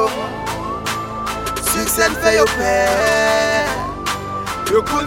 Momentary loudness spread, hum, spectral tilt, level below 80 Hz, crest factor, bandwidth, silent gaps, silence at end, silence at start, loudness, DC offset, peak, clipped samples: 10 LU; none; -3 dB/octave; -36 dBFS; 16 dB; 17 kHz; none; 0 s; 0 s; -17 LUFS; under 0.1%; -2 dBFS; under 0.1%